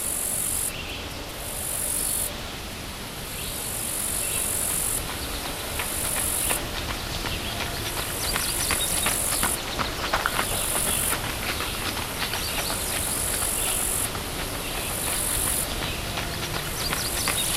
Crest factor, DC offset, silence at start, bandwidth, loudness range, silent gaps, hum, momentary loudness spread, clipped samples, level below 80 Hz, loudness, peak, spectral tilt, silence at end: 22 dB; under 0.1%; 0 s; 16 kHz; 3 LU; none; none; 7 LU; under 0.1%; -38 dBFS; -25 LUFS; -6 dBFS; -1.5 dB/octave; 0 s